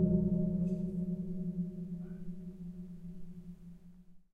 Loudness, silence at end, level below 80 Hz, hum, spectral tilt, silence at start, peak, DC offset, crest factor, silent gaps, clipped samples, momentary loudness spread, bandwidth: -37 LUFS; 0.15 s; -52 dBFS; none; -12 dB/octave; 0 s; -18 dBFS; under 0.1%; 18 dB; none; under 0.1%; 19 LU; 1.6 kHz